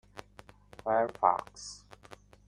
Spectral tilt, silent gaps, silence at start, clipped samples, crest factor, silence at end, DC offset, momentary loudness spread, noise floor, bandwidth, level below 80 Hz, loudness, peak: -4 dB/octave; none; 0.15 s; under 0.1%; 24 dB; 0.7 s; under 0.1%; 23 LU; -56 dBFS; 13 kHz; -64 dBFS; -30 LUFS; -10 dBFS